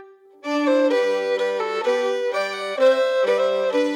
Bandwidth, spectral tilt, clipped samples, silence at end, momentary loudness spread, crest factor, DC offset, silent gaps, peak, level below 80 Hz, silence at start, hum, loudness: 11 kHz; -3.5 dB/octave; under 0.1%; 0 s; 6 LU; 14 dB; under 0.1%; none; -6 dBFS; under -90 dBFS; 0 s; none; -21 LUFS